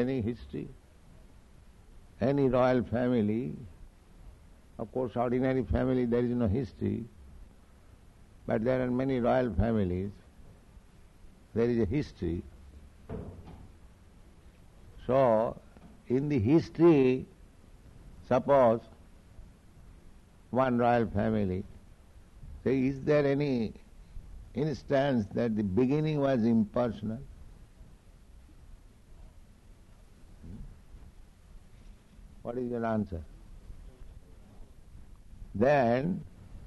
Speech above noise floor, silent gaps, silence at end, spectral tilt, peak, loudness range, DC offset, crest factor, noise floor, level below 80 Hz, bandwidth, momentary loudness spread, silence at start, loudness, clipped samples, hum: 28 dB; none; 0 s; -9 dB/octave; -12 dBFS; 11 LU; under 0.1%; 18 dB; -56 dBFS; -50 dBFS; 11.5 kHz; 21 LU; 0 s; -29 LUFS; under 0.1%; none